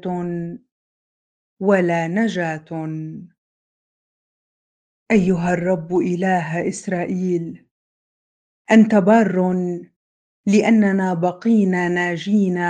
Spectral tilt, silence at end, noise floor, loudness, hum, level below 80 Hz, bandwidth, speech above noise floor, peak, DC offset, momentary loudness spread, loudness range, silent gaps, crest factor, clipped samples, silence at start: -7 dB/octave; 0 s; under -90 dBFS; -19 LUFS; none; -58 dBFS; 9.4 kHz; over 72 dB; 0 dBFS; under 0.1%; 13 LU; 7 LU; 0.72-1.57 s, 3.38-5.06 s, 7.71-8.65 s, 9.96-10.44 s; 18 dB; under 0.1%; 0.05 s